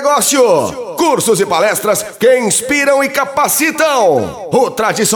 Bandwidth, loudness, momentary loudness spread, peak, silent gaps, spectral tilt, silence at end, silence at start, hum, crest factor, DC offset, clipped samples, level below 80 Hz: over 20 kHz; -12 LUFS; 5 LU; 0 dBFS; none; -2.5 dB/octave; 0 s; 0 s; none; 12 dB; under 0.1%; under 0.1%; -52 dBFS